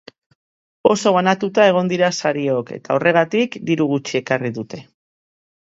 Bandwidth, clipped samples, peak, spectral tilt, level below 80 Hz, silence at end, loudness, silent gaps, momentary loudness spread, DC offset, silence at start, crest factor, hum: 8 kHz; under 0.1%; 0 dBFS; -5 dB/octave; -64 dBFS; 0.85 s; -18 LUFS; none; 8 LU; under 0.1%; 0.85 s; 18 dB; none